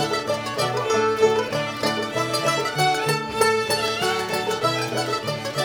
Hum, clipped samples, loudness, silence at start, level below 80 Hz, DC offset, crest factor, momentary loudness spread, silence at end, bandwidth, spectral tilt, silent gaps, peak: none; under 0.1%; -22 LUFS; 0 s; -58 dBFS; under 0.1%; 16 dB; 5 LU; 0 s; over 20 kHz; -3.5 dB/octave; none; -6 dBFS